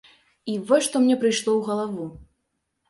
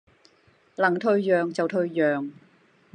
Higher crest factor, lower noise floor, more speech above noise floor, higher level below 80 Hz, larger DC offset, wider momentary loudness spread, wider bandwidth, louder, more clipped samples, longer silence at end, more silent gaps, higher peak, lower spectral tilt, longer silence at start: about the same, 18 dB vs 18 dB; first, -76 dBFS vs -61 dBFS; first, 54 dB vs 37 dB; first, -60 dBFS vs -80 dBFS; neither; first, 15 LU vs 10 LU; first, 11.5 kHz vs 9.6 kHz; about the same, -22 LUFS vs -24 LUFS; neither; about the same, 0.65 s vs 0.6 s; neither; about the same, -6 dBFS vs -8 dBFS; second, -4 dB/octave vs -7 dB/octave; second, 0.45 s vs 0.8 s